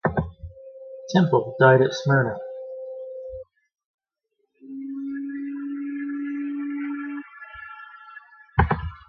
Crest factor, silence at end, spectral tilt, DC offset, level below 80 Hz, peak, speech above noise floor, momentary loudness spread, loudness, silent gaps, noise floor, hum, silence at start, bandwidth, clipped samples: 24 dB; 0.1 s; -7.5 dB/octave; under 0.1%; -42 dBFS; -2 dBFS; 57 dB; 22 LU; -24 LUFS; 3.85-3.98 s; -75 dBFS; none; 0.05 s; 6.8 kHz; under 0.1%